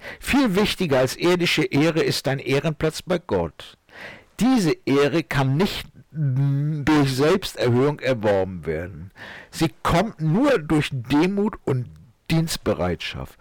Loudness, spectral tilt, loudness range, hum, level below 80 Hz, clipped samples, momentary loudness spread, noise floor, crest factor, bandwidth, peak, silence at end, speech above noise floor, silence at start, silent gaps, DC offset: -22 LUFS; -6 dB/octave; 2 LU; none; -44 dBFS; under 0.1%; 12 LU; -42 dBFS; 8 dB; 18.5 kHz; -14 dBFS; 0.15 s; 20 dB; 0 s; none; under 0.1%